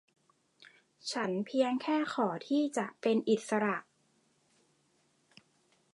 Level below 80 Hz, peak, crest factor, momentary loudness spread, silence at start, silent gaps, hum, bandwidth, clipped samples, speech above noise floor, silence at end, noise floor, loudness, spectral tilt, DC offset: -88 dBFS; -16 dBFS; 18 dB; 6 LU; 0.6 s; none; none; 11.5 kHz; under 0.1%; 41 dB; 2.1 s; -73 dBFS; -33 LUFS; -5 dB/octave; under 0.1%